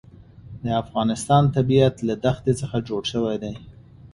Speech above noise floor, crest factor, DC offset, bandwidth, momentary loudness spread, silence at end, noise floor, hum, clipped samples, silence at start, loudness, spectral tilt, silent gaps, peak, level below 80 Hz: 22 dB; 18 dB; under 0.1%; 11.5 kHz; 14 LU; 0.1 s; -43 dBFS; none; under 0.1%; 0.45 s; -22 LUFS; -6.5 dB/octave; none; -4 dBFS; -48 dBFS